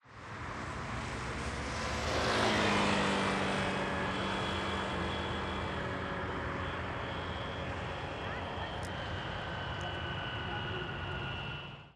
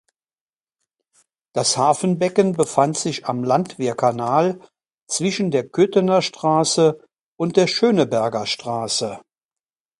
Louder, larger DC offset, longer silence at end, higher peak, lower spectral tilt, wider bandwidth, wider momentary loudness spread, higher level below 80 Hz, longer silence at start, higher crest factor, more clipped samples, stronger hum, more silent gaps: second, -35 LUFS vs -19 LUFS; neither; second, 0.05 s vs 0.8 s; second, -18 dBFS vs 0 dBFS; about the same, -4.5 dB/octave vs -4.5 dB/octave; first, 13 kHz vs 11.5 kHz; about the same, 9 LU vs 7 LU; first, -50 dBFS vs -64 dBFS; second, 0.05 s vs 1.55 s; about the same, 18 dB vs 20 dB; neither; neither; second, none vs 4.94-5.07 s, 7.21-7.38 s